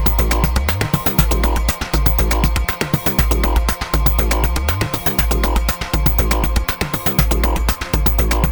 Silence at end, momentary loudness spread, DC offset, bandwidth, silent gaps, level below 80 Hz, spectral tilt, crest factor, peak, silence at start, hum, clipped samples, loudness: 0 s; 3 LU; under 0.1%; over 20 kHz; none; -18 dBFS; -5 dB/octave; 16 dB; 0 dBFS; 0 s; none; under 0.1%; -17 LUFS